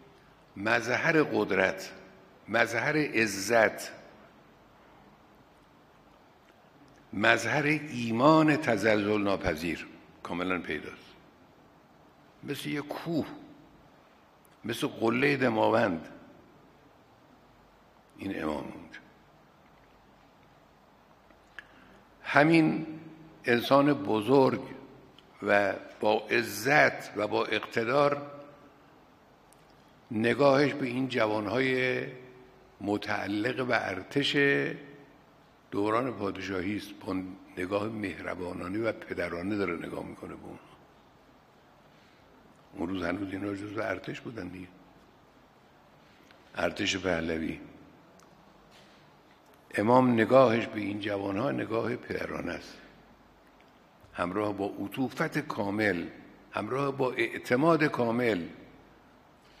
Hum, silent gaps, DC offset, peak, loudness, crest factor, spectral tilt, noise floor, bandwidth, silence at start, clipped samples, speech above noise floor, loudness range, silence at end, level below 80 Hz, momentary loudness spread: none; none; under 0.1%; -4 dBFS; -29 LUFS; 26 dB; -5.5 dB/octave; -60 dBFS; 15.5 kHz; 0.55 s; under 0.1%; 31 dB; 12 LU; 0.95 s; -62 dBFS; 19 LU